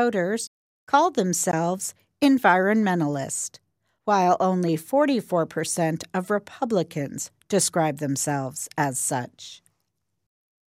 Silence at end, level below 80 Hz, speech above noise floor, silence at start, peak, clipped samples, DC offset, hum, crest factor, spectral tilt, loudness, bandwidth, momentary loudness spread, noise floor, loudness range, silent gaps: 1.15 s; -72 dBFS; 54 dB; 0 s; -6 dBFS; under 0.1%; under 0.1%; none; 18 dB; -4.5 dB/octave; -24 LUFS; 16 kHz; 11 LU; -78 dBFS; 4 LU; 0.47-0.87 s